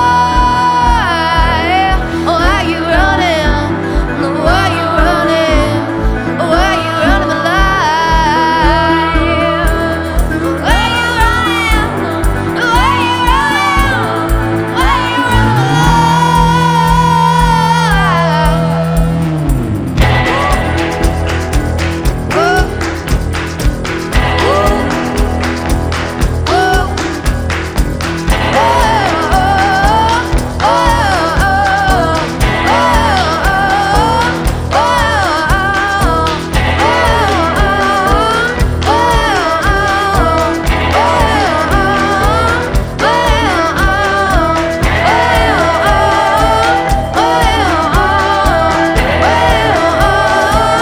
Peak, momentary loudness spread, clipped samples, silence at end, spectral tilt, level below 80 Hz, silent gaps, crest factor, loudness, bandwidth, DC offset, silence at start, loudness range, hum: 0 dBFS; 5 LU; under 0.1%; 0 s; -5 dB/octave; -18 dBFS; none; 10 dB; -11 LUFS; 18.5 kHz; 0.1%; 0 s; 3 LU; none